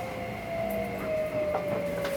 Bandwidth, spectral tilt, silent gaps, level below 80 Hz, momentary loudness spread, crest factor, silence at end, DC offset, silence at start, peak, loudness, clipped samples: over 20 kHz; -6 dB/octave; none; -52 dBFS; 5 LU; 16 dB; 0 s; under 0.1%; 0 s; -16 dBFS; -31 LUFS; under 0.1%